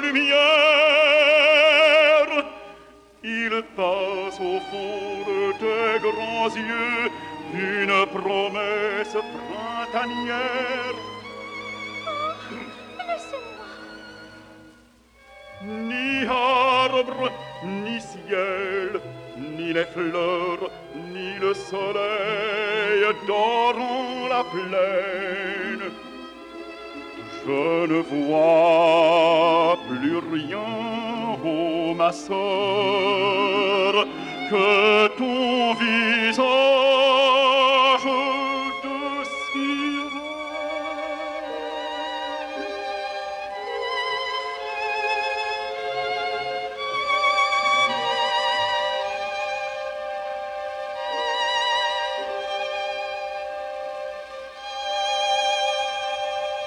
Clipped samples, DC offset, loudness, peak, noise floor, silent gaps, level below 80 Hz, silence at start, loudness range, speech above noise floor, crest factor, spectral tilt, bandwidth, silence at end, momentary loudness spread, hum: under 0.1%; under 0.1%; -22 LUFS; -6 dBFS; -54 dBFS; none; -62 dBFS; 0 s; 10 LU; 32 dB; 18 dB; -3.5 dB/octave; 11 kHz; 0 s; 16 LU; none